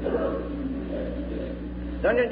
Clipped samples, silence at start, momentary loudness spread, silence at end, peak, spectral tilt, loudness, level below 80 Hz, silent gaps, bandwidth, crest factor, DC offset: under 0.1%; 0 s; 9 LU; 0 s; -10 dBFS; -11 dB/octave; -29 LUFS; -38 dBFS; none; 5 kHz; 16 dB; under 0.1%